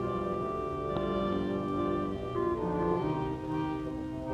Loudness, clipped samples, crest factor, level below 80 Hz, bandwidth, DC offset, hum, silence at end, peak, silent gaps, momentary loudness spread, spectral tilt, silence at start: -33 LUFS; under 0.1%; 14 dB; -48 dBFS; 10.5 kHz; under 0.1%; none; 0 s; -18 dBFS; none; 4 LU; -8.5 dB/octave; 0 s